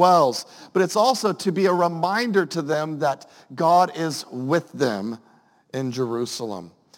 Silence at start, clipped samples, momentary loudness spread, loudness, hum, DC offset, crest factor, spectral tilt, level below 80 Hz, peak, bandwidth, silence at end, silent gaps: 0 s; under 0.1%; 14 LU; -22 LUFS; none; under 0.1%; 20 dB; -5 dB/octave; -74 dBFS; -4 dBFS; 17 kHz; 0.3 s; none